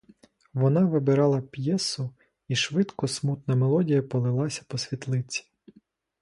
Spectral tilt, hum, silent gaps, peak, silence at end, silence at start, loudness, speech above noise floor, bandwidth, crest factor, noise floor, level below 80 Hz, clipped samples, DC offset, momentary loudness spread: -6 dB/octave; none; none; -10 dBFS; 0.8 s; 0.55 s; -26 LUFS; 37 dB; 11.5 kHz; 16 dB; -62 dBFS; -66 dBFS; under 0.1%; under 0.1%; 10 LU